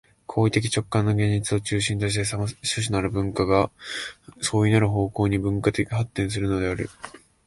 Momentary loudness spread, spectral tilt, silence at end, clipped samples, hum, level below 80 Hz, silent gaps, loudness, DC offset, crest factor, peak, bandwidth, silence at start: 10 LU; -5.5 dB/octave; 0.3 s; under 0.1%; none; -44 dBFS; none; -24 LUFS; under 0.1%; 18 dB; -6 dBFS; 11.5 kHz; 0.3 s